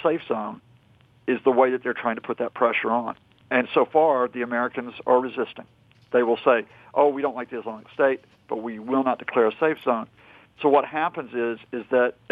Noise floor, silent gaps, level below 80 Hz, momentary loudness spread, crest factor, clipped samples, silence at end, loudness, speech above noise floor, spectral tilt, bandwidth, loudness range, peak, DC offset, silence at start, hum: -57 dBFS; none; -72 dBFS; 12 LU; 18 dB; under 0.1%; 0.2 s; -24 LUFS; 34 dB; -7.5 dB/octave; 4.8 kHz; 2 LU; -6 dBFS; under 0.1%; 0 s; none